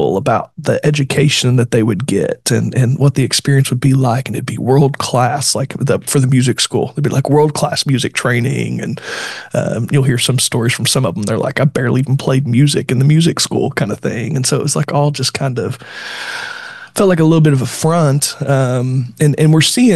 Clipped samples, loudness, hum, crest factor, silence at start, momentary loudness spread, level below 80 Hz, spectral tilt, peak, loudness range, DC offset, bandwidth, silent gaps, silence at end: under 0.1%; -14 LUFS; none; 12 dB; 0 s; 8 LU; -50 dBFS; -5 dB/octave; -2 dBFS; 2 LU; 0.2%; 12.5 kHz; none; 0 s